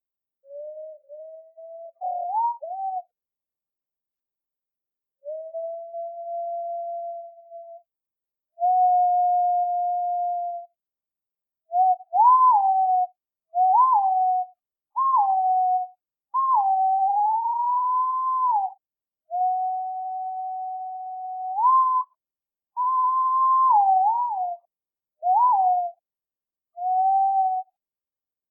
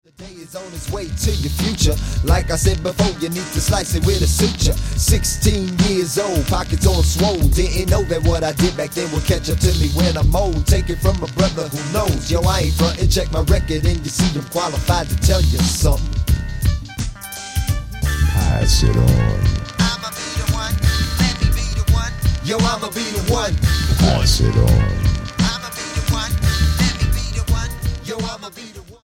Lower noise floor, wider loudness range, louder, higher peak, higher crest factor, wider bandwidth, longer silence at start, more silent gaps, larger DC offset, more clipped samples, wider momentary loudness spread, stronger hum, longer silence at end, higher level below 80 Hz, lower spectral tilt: first, under -90 dBFS vs -37 dBFS; first, 14 LU vs 2 LU; second, -22 LUFS vs -18 LUFS; second, -8 dBFS vs -2 dBFS; about the same, 16 dB vs 16 dB; second, 1.2 kHz vs 17 kHz; first, 0.5 s vs 0.2 s; neither; neither; neither; first, 19 LU vs 8 LU; neither; first, 0.9 s vs 0.1 s; second, under -90 dBFS vs -22 dBFS; about the same, -4.5 dB/octave vs -5 dB/octave